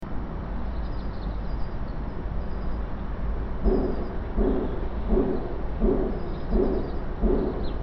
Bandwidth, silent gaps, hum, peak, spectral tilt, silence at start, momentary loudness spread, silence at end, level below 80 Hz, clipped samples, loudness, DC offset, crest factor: 5.6 kHz; none; none; -10 dBFS; -8 dB/octave; 0 s; 9 LU; 0 s; -30 dBFS; under 0.1%; -29 LUFS; under 0.1%; 16 dB